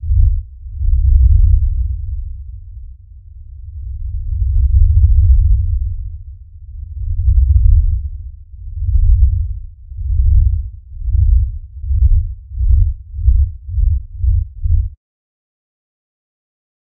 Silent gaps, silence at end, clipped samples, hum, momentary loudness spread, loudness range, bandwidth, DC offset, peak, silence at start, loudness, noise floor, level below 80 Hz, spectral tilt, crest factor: none; 1.95 s; under 0.1%; none; 21 LU; 4 LU; 0.3 kHz; under 0.1%; 0 dBFS; 0 s; -16 LUFS; -36 dBFS; -14 dBFS; -26.5 dB/octave; 14 dB